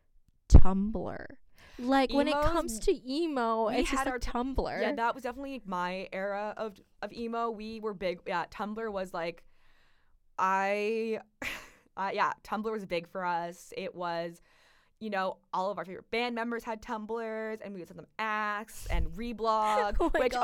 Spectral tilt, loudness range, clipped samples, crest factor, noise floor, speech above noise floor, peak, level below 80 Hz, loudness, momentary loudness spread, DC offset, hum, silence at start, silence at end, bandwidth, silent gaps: -6 dB/octave; 6 LU; under 0.1%; 22 dB; -64 dBFS; 32 dB; -8 dBFS; -36 dBFS; -32 LUFS; 13 LU; under 0.1%; none; 0.5 s; 0 s; 13 kHz; none